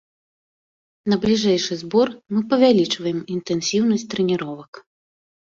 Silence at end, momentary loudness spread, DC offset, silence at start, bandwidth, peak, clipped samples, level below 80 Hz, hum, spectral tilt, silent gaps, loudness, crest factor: 0.75 s; 10 LU; under 0.1%; 1.05 s; 7.8 kHz; -4 dBFS; under 0.1%; -58 dBFS; none; -5 dB/octave; 4.68-4.73 s; -20 LUFS; 18 dB